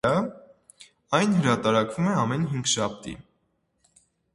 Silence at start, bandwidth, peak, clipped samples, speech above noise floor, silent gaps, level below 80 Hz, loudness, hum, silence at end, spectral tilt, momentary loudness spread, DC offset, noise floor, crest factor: 0.05 s; 11.5 kHz; -6 dBFS; under 0.1%; 48 dB; none; -58 dBFS; -24 LUFS; none; 1.15 s; -5 dB/octave; 15 LU; under 0.1%; -72 dBFS; 22 dB